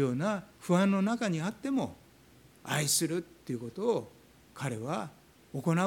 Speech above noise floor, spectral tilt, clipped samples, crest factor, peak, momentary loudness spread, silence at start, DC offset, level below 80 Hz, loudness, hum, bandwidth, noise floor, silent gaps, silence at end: 28 dB; -5 dB/octave; under 0.1%; 18 dB; -14 dBFS; 13 LU; 0 s; under 0.1%; -68 dBFS; -32 LUFS; none; 19 kHz; -59 dBFS; none; 0 s